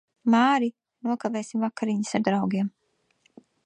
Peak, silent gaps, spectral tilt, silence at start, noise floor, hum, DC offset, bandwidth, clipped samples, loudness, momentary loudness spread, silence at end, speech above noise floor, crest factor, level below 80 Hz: -8 dBFS; none; -5.5 dB/octave; 0.25 s; -68 dBFS; none; under 0.1%; 10 kHz; under 0.1%; -25 LUFS; 10 LU; 0.95 s; 44 dB; 18 dB; -74 dBFS